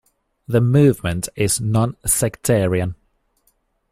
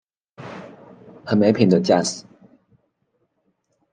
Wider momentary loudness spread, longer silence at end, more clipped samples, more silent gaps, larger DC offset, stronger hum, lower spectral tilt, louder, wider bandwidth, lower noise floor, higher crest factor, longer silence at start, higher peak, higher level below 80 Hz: second, 8 LU vs 24 LU; second, 1 s vs 1.7 s; neither; neither; neither; neither; about the same, -5.5 dB/octave vs -6 dB/octave; about the same, -18 LUFS vs -18 LUFS; first, 16 kHz vs 9.6 kHz; second, -65 dBFS vs -70 dBFS; about the same, 18 dB vs 20 dB; about the same, 0.5 s vs 0.4 s; about the same, -2 dBFS vs -4 dBFS; first, -44 dBFS vs -66 dBFS